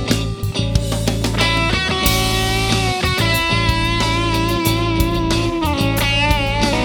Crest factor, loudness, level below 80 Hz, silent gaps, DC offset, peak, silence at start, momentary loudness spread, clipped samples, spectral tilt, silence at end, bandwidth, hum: 16 dB; -17 LUFS; -26 dBFS; none; under 0.1%; 0 dBFS; 0 s; 4 LU; under 0.1%; -4.5 dB/octave; 0 s; over 20 kHz; none